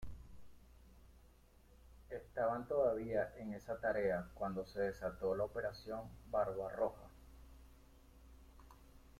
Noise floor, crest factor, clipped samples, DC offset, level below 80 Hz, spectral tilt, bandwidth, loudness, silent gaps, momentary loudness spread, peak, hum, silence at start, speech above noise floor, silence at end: -65 dBFS; 18 dB; under 0.1%; under 0.1%; -60 dBFS; -7 dB/octave; 16 kHz; -41 LUFS; none; 24 LU; -24 dBFS; none; 0 s; 26 dB; 0 s